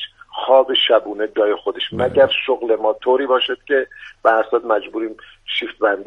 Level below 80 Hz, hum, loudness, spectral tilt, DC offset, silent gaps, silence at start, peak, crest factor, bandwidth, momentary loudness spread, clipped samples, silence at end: -58 dBFS; none; -18 LUFS; -5.5 dB/octave; under 0.1%; none; 0 s; 0 dBFS; 18 dB; 5.2 kHz; 12 LU; under 0.1%; 0 s